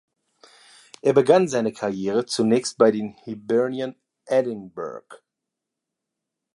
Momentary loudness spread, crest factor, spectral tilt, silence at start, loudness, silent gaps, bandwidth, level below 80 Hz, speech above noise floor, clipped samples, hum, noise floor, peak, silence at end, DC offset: 16 LU; 22 dB; -5.5 dB/octave; 1.05 s; -22 LUFS; none; 11.5 kHz; -70 dBFS; 63 dB; under 0.1%; none; -84 dBFS; -2 dBFS; 1.4 s; under 0.1%